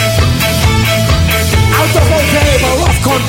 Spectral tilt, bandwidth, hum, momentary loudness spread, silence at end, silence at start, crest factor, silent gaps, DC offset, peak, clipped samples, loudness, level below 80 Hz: -4.5 dB/octave; 16.5 kHz; none; 1 LU; 0 s; 0 s; 10 dB; none; under 0.1%; 0 dBFS; under 0.1%; -10 LUFS; -18 dBFS